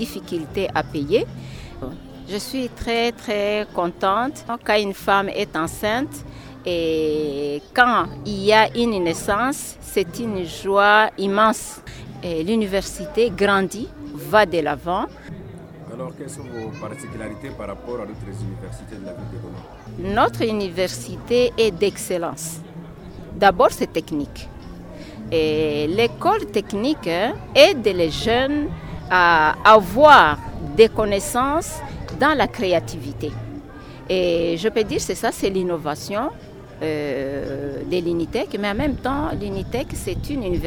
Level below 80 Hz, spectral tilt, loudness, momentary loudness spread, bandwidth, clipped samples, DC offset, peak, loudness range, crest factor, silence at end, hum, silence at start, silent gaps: -42 dBFS; -4.5 dB/octave; -20 LUFS; 19 LU; over 20 kHz; under 0.1%; under 0.1%; 0 dBFS; 10 LU; 20 dB; 0 s; none; 0 s; none